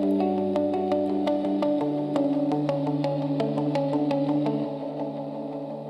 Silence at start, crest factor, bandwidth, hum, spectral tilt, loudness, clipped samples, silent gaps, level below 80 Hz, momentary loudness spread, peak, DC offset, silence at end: 0 s; 16 dB; 8.2 kHz; none; -8.5 dB/octave; -26 LUFS; under 0.1%; none; -70 dBFS; 7 LU; -10 dBFS; under 0.1%; 0 s